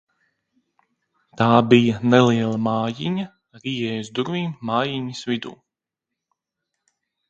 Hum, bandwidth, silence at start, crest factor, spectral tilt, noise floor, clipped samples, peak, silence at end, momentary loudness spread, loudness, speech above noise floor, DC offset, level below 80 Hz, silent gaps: none; 7.8 kHz; 1.35 s; 22 dB; -6.5 dB/octave; -85 dBFS; under 0.1%; 0 dBFS; 1.75 s; 13 LU; -21 LUFS; 65 dB; under 0.1%; -60 dBFS; none